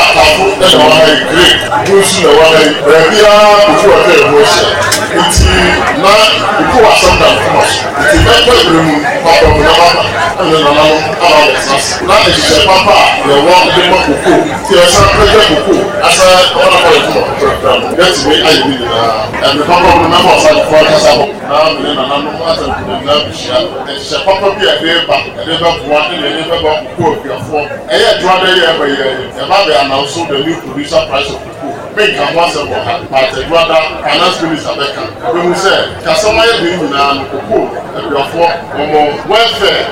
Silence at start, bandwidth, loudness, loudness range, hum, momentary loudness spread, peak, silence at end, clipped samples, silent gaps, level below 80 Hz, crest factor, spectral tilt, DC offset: 0 s; 17 kHz; -7 LUFS; 6 LU; none; 9 LU; 0 dBFS; 0 s; 2%; none; -26 dBFS; 8 dB; -3.5 dB/octave; under 0.1%